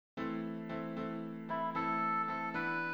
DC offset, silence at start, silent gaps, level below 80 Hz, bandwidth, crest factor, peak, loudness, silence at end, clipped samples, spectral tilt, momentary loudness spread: under 0.1%; 0.15 s; none; -74 dBFS; over 20 kHz; 14 dB; -24 dBFS; -37 LUFS; 0 s; under 0.1%; -7.5 dB/octave; 8 LU